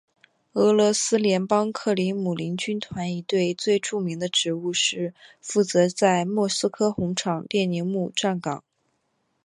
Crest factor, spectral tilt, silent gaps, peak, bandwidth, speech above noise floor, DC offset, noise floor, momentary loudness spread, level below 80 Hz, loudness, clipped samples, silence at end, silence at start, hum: 18 dB; -4 dB/octave; none; -6 dBFS; 11.5 kHz; 49 dB; under 0.1%; -72 dBFS; 9 LU; -64 dBFS; -24 LUFS; under 0.1%; 0.85 s; 0.55 s; none